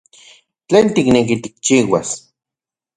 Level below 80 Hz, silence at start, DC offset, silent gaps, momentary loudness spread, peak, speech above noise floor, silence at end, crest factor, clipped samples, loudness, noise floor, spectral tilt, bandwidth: -50 dBFS; 0.7 s; under 0.1%; none; 9 LU; 0 dBFS; 74 dB; 0.8 s; 16 dB; under 0.1%; -15 LUFS; -88 dBFS; -4.5 dB/octave; 11 kHz